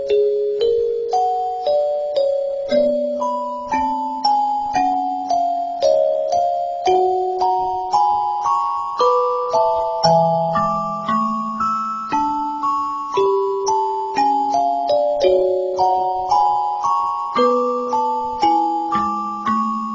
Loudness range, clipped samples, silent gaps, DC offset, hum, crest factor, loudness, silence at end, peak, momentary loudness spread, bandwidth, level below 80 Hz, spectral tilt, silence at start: 2 LU; under 0.1%; none; under 0.1%; none; 16 dB; -19 LUFS; 0 s; -2 dBFS; 5 LU; 7.6 kHz; -52 dBFS; -5.5 dB/octave; 0 s